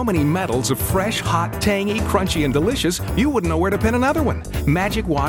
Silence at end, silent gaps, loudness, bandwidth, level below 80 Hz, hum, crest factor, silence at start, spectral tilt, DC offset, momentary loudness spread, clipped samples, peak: 0 s; none; -19 LUFS; 19.5 kHz; -30 dBFS; none; 16 dB; 0 s; -5.5 dB/octave; under 0.1%; 3 LU; under 0.1%; -4 dBFS